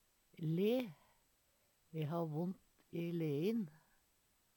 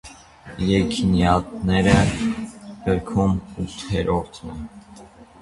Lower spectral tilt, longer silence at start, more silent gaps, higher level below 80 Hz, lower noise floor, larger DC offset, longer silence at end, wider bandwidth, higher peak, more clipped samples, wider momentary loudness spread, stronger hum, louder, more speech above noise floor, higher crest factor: first, -8 dB/octave vs -6.5 dB/octave; first, 0.4 s vs 0.05 s; neither; second, -84 dBFS vs -36 dBFS; first, -77 dBFS vs -45 dBFS; neither; first, 0.85 s vs 0.2 s; first, 19 kHz vs 11.5 kHz; second, -26 dBFS vs -2 dBFS; neither; second, 13 LU vs 18 LU; neither; second, -41 LUFS vs -21 LUFS; first, 38 dB vs 24 dB; about the same, 16 dB vs 20 dB